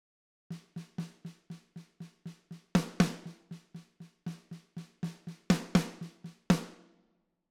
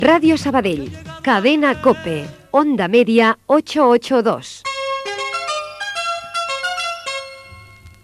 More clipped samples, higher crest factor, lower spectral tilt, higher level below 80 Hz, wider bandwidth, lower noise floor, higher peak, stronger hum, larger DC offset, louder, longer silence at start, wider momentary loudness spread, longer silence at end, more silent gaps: neither; first, 26 dB vs 16 dB; first, -6 dB/octave vs -4.5 dB/octave; second, -58 dBFS vs -52 dBFS; first, 15.5 kHz vs 13.5 kHz; first, -75 dBFS vs -41 dBFS; second, -10 dBFS vs 0 dBFS; neither; neither; second, -34 LUFS vs -17 LUFS; first, 0.5 s vs 0 s; first, 20 LU vs 12 LU; first, 0.75 s vs 0.15 s; neither